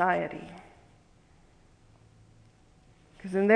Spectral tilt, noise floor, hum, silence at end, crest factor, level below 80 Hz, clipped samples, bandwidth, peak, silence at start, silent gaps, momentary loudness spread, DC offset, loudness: -7.5 dB/octave; -60 dBFS; none; 0 s; 24 dB; -64 dBFS; under 0.1%; 10 kHz; -8 dBFS; 0 s; none; 23 LU; under 0.1%; -33 LUFS